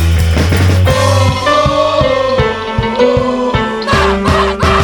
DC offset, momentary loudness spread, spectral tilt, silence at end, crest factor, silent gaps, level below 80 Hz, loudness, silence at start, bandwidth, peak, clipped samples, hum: under 0.1%; 4 LU; -5.5 dB/octave; 0 s; 10 dB; none; -22 dBFS; -11 LUFS; 0 s; 18 kHz; 0 dBFS; under 0.1%; none